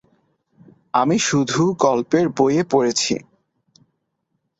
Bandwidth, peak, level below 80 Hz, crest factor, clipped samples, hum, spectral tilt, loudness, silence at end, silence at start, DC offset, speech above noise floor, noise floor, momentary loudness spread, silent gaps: 8.2 kHz; -2 dBFS; -60 dBFS; 18 dB; under 0.1%; none; -4.5 dB/octave; -19 LUFS; 1.35 s; 0.95 s; under 0.1%; 55 dB; -73 dBFS; 5 LU; none